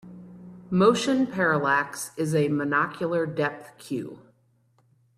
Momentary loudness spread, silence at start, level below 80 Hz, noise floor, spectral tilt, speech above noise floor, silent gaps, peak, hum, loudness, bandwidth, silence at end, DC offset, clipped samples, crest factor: 22 LU; 0.05 s; -66 dBFS; -65 dBFS; -5.5 dB/octave; 40 dB; none; -8 dBFS; none; -25 LUFS; 14 kHz; 1 s; under 0.1%; under 0.1%; 18 dB